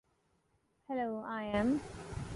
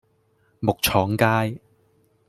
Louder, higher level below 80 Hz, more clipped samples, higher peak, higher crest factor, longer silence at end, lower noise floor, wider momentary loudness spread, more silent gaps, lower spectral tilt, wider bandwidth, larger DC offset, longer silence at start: second, -37 LUFS vs -22 LUFS; second, -56 dBFS vs -50 dBFS; neither; second, -20 dBFS vs -2 dBFS; about the same, 18 dB vs 22 dB; second, 0 s vs 0.7 s; first, -76 dBFS vs -64 dBFS; about the same, 11 LU vs 9 LU; neither; first, -6.5 dB/octave vs -5 dB/octave; second, 11.5 kHz vs 16 kHz; neither; first, 0.9 s vs 0.6 s